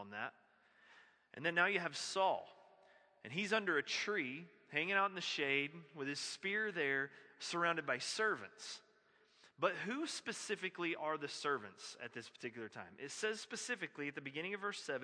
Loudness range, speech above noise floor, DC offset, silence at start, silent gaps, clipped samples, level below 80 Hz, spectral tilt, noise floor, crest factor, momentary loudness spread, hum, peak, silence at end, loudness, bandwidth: 5 LU; 31 dB; under 0.1%; 0 s; none; under 0.1%; under -90 dBFS; -3 dB/octave; -72 dBFS; 24 dB; 14 LU; none; -18 dBFS; 0 s; -40 LUFS; 10.5 kHz